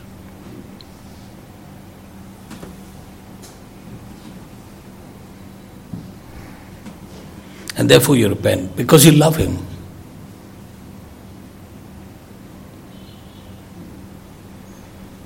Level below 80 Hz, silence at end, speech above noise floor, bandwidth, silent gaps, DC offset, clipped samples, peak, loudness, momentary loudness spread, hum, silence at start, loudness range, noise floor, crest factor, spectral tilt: -46 dBFS; 0.2 s; 26 dB; 16.5 kHz; none; under 0.1%; under 0.1%; 0 dBFS; -13 LUFS; 27 LU; none; 0.45 s; 24 LU; -39 dBFS; 22 dB; -5 dB/octave